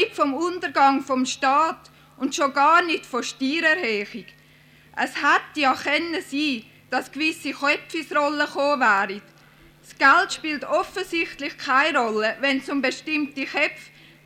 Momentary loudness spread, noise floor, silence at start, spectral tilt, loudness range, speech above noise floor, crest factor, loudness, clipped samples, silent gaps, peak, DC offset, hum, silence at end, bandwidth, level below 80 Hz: 10 LU; -53 dBFS; 0 s; -2.5 dB/octave; 3 LU; 30 dB; 16 dB; -22 LUFS; under 0.1%; none; -6 dBFS; under 0.1%; none; 0.4 s; 15.5 kHz; -64 dBFS